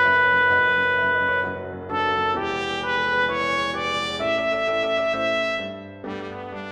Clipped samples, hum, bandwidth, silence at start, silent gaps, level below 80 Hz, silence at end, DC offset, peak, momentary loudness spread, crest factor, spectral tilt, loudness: under 0.1%; none; 11.5 kHz; 0 s; none; -56 dBFS; 0 s; under 0.1%; -8 dBFS; 15 LU; 14 dB; -4 dB/octave; -21 LUFS